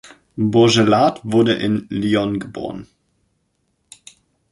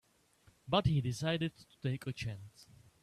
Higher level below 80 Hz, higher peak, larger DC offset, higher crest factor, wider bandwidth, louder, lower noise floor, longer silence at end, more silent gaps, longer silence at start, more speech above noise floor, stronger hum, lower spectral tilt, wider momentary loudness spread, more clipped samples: first, -52 dBFS vs -58 dBFS; first, -2 dBFS vs -16 dBFS; neither; about the same, 18 dB vs 22 dB; second, 11.5 kHz vs 13.5 kHz; first, -17 LUFS vs -36 LUFS; about the same, -68 dBFS vs -68 dBFS; first, 1.7 s vs 0.4 s; neither; second, 0.05 s vs 0.65 s; first, 51 dB vs 33 dB; neither; about the same, -5.5 dB/octave vs -6 dB/octave; first, 17 LU vs 12 LU; neither